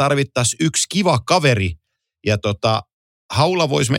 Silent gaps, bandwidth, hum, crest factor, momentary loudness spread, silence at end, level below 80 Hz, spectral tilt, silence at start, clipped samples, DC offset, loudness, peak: 2.93-3.29 s; 16.5 kHz; none; 18 dB; 8 LU; 0 s; -48 dBFS; -4.5 dB/octave; 0 s; under 0.1%; under 0.1%; -18 LUFS; -2 dBFS